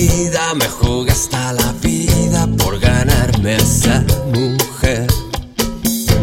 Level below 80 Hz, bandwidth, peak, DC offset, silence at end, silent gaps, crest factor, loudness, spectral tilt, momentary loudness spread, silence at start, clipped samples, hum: -22 dBFS; 16.5 kHz; 0 dBFS; under 0.1%; 0 s; none; 14 dB; -15 LUFS; -4.5 dB/octave; 5 LU; 0 s; under 0.1%; none